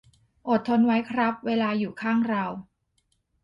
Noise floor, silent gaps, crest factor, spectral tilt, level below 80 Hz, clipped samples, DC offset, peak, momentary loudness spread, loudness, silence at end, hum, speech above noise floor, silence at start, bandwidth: -72 dBFS; none; 14 dB; -7.5 dB/octave; -66 dBFS; under 0.1%; under 0.1%; -12 dBFS; 10 LU; -25 LUFS; 0.8 s; none; 48 dB; 0.45 s; 5.6 kHz